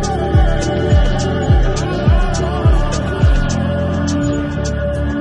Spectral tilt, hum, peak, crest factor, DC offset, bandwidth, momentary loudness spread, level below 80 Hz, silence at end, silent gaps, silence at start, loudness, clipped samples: -6.5 dB/octave; none; -2 dBFS; 12 dB; under 0.1%; 10.5 kHz; 4 LU; -18 dBFS; 0 s; none; 0 s; -16 LUFS; under 0.1%